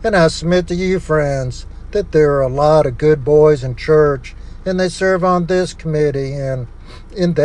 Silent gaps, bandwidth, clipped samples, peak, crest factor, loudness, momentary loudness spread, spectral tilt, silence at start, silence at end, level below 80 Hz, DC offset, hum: none; 10.5 kHz; under 0.1%; 0 dBFS; 14 dB; -15 LUFS; 12 LU; -6.5 dB/octave; 0 s; 0 s; -32 dBFS; under 0.1%; none